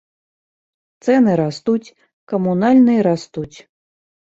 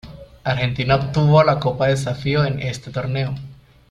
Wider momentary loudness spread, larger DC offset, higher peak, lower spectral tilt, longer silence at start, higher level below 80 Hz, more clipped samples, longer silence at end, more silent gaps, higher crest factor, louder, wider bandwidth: first, 15 LU vs 12 LU; neither; about the same, -4 dBFS vs -2 dBFS; about the same, -7.5 dB/octave vs -6.5 dB/octave; first, 1.05 s vs 0.05 s; second, -60 dBFS vs -44 dBFS; neither; first, 0.85 s vs 0.35 s; first, 2.13-2.27 s vs none; about the same, 14 dB vs 18 dB; first, -16 LUFS vs -19 LUFS; second, 7.8 kHz vs 11 kHz